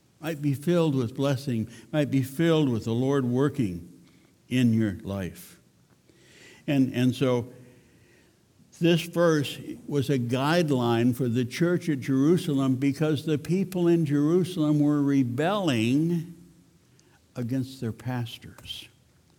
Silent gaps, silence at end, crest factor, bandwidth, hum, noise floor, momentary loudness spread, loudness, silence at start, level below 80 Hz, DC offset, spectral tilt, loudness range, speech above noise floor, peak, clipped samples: none; 0.55 s; 16 dB; 19 kHz; none; -61 dBFS; 11 LU; -26 LUFS; 0.2 s; -64 dBFS; under 0.1%; -7 dB/octave; 6 LU; 36 dB; -10 dBFS; under 0.1%